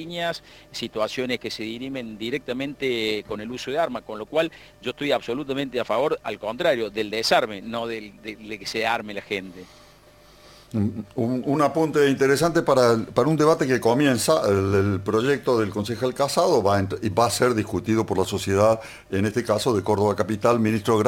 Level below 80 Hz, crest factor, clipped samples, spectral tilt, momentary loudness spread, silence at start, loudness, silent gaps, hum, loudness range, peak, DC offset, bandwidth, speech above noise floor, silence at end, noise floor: -56 dBFS; 20 dB; under 0.1%; -5 dB/octave; 11 LU; 0 s; -23 LUFS; none; none; 8 LU; -4 dBFS; under 0.1%; 17 kHz; 28 dB; 0 s; -51 dBFS